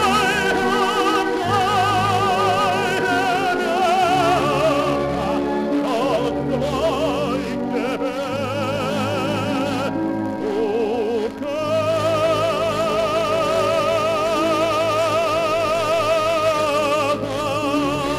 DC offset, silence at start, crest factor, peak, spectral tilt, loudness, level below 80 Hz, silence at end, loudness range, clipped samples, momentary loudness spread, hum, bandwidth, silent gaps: under 0.1%; 0 s; 14 dB; -6 dBFS; -5 dB/octave; -20 LUFS; -46 dBFS; 0 s; 4 LU; under 0.1%; 5 LU; none; 15.5 kHz; none